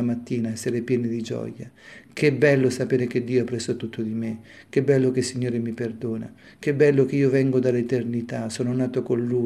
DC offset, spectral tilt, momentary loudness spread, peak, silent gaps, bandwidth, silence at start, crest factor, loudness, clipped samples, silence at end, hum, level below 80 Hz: under 0.1%; -6.5 dB/octave; 12 LU; -4 dBFS; none; 13 kHz; 0 s; 18 dB; -24 LUFS; under 0.1%; 0 s; none; -64 dBFS